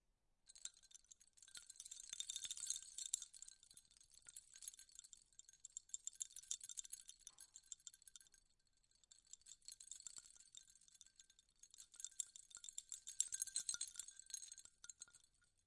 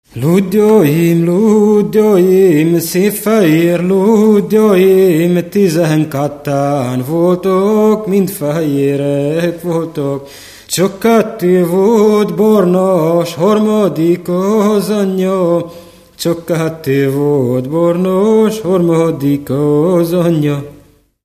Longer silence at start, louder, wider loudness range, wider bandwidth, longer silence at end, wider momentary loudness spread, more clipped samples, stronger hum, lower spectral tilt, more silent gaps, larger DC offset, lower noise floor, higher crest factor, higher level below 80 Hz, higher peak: first, 0.45 s vs 0.15 s; second, -51 LUFS vs -12 LUFS; first, 12 LU vs 4 LU; second, 12 kHz vs 15 kHz; second, 0.2 s vs 0.5 s; first, 19 LU vs 7 LU; neither; neither; second, 3.5 dB/octave vs -7 dB/octave; neither; neither; first, -80 dBFS vs -44 dBFS; first, 36 dB vs 12 dB; second, -86 dBFS vs -50 dBFS; second, -18 dBFS vs 0 dBFS